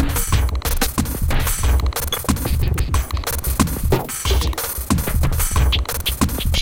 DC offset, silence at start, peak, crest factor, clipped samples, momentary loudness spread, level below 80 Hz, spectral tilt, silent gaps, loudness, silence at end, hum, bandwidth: under 0.1%; 0 s; -2 dBFS; 16 dB; under 0.1%; 3 LU; -22 dBFS; -4 dB/octave; none; -20 LUFS; 0 s; none; 17.5 kHz